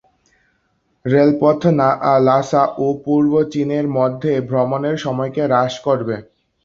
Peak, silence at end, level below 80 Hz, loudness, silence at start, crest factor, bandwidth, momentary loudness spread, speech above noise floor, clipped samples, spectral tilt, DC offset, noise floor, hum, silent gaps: -2 dBFS; 0.4 s; -56 dBFS; -17 LUFS; 1.05 s; 16 dB; 7.4 kHz; 7 LU; 49 dB; under 0.1%; -7.5 dB/octave; under 0.1%; -65 dBFS; none; none